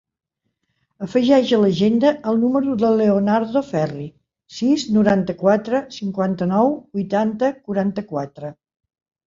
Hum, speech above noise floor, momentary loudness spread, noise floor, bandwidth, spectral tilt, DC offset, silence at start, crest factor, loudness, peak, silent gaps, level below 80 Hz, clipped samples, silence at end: none; 55 dB; 12 LU; -73 dBFS; 7.6 kHz; -7 dB/octave; under 0.1%; 1 s; 16 dB; -19 LUFS; -2 dBFS; none; -58 dBFS; under 0.1%; 0.75 s